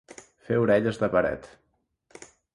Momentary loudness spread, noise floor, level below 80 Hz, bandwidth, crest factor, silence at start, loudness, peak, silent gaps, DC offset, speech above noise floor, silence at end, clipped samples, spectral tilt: 8 LU; -67 dBFS; -56 dBFS; 11.5 kHz; 18 dB; 0.5 s; -25 LUFS; -10 dBFS; none; under 0.1%; 43 dB; 1.1 s; under 0.1%; -7 dB/octave